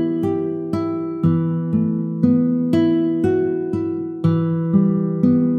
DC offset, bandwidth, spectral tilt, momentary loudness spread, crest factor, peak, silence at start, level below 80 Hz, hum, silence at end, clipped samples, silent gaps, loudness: under 0.1%; 4.9 kHz; -10.5 dB/octave; 6 LU; 14 dB; -4 dBFS; 0 s; -56 dBFS; none; 0 s; under 0.1%; none; -19 LUFS